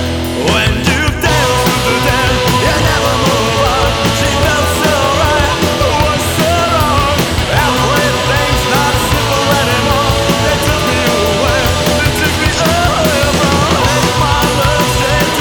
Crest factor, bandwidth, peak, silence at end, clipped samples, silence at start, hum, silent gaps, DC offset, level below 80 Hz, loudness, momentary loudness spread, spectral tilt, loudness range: 12 dB; over 20 kHz; 0 dBFS; 0 s; under 0.1%; 0 s; none; none; under 0.1%; -24 dBFS; -11 LUFS; 1 LU; -4 dB/octave; 0 LU